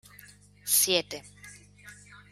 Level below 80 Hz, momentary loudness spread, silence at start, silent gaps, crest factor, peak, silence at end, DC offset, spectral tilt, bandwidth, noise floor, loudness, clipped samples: -66 dBFS; 26 LU; 0.65 s; none; 22 dB; -10 dBFS; 0.15 s; under 0.1%; -0.5 dB/octave; 16 kHz; -54 dBFS; -24 LUFS; under 0.1%